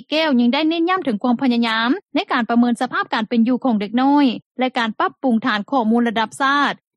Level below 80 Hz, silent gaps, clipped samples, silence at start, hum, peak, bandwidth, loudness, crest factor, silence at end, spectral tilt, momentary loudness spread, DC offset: -68 dBFS; 4.46-4.55 s; under 0.1%; 0.1 s; none; -4 dBFS; 11.5 kHz; -18 LUFS; 14 dB; 0.2 s; -5 dB/octave; 5 LU; under 0.1%